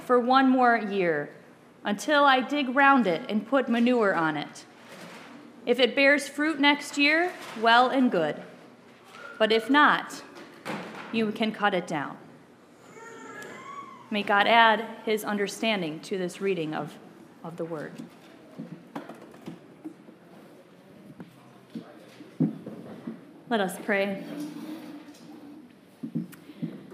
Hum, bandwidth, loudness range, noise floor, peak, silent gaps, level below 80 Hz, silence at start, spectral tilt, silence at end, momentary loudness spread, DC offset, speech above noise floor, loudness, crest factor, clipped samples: none; 15.5 kHz; 18 LU; -53 dBFS; -4 dBFS; none; -82 dBFS; 0 s; -4.5 dB/octave; 0 s; 25 LU; under 0.1%; 29 dB; -24 LUFS; 24 dB; under 0.1%